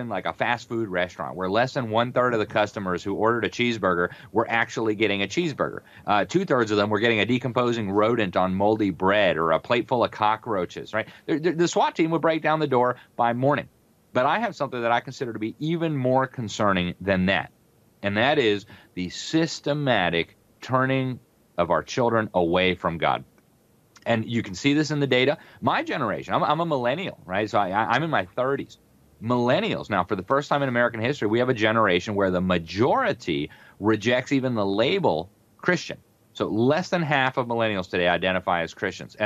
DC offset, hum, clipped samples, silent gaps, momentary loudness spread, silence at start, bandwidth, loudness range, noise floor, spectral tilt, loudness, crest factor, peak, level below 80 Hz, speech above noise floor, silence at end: under 0.1%; none; under 0.1%; none; 8 LU; 0 s; 13.5 kHz; 2 LU; -60 dBFS; -5.5 dB/octave; -24 LUFS; 18 dB; -6 dBFS; -60 dBFS; 37 dB; 0 s